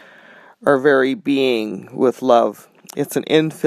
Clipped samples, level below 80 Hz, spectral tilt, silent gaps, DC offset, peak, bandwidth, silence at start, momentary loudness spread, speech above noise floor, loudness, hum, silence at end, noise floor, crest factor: under 0.1%; -70 dBFS; -5.5 dB/octave; none; under 0.1%; 0 dBFS; 15 kHz; 0.65 s; 9 LU; 28 dB; -18 LUFS; none; 0 s; -45 dBFS; 18 dB